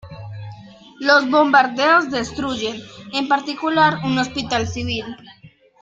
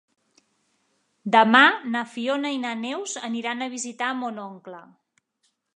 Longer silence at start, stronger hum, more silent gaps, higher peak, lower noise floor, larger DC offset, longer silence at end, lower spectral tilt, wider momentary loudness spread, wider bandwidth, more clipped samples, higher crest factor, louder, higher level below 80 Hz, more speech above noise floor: second, 0.05 s vs 1.25 s; neither; neither; about the same, 0 dBFS vs -2 dBFS; second, -41 dBFS vs -72 dBFS; neither; second, 0.35 s vs 0.95 s; first, -4.5 dB/octave vs -3 dB/octave; about the same, 20 LU vs 21 LU; second, 9 kHz vs 11 kHz; neither; second, 18 dB vs 24 dB; first, -18 LUFS vs -22 LUFS; first, -52 dBFS vs -80 dBFS; second, 23 dB vs 49 dB